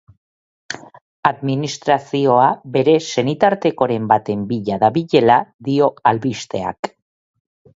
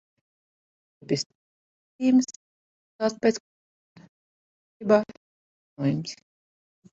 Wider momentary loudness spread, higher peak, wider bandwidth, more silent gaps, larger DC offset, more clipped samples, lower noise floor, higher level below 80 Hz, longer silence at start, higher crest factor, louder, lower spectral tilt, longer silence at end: second, 11 LU vs 15 LU; first, 0 dBFS vs -6 dBFS; about the same, 8 kHz vs 8 kHz; second, 1.01-1.23 s, 5.54-5.59 s, 6.79-6.83 s vs 1.26-1.99 s, 2.36-2.99 s, 3.40-3.96 s, 4.09-4.80 s, 5.17-5.76 s; neither; neither; about the same, under -90 dBFS vs under -90 dBFS; first, -58 dBFS vs -72 dBFS; second, 0.7 s vs 1.1 s; about the same, 18 dB vs 22 dB; first, -17 LUFS vs -26 LUFS; about the same, -6 dB/octave vs -5.5 dB/octave; about the same, 0.9 s vs 0.8 s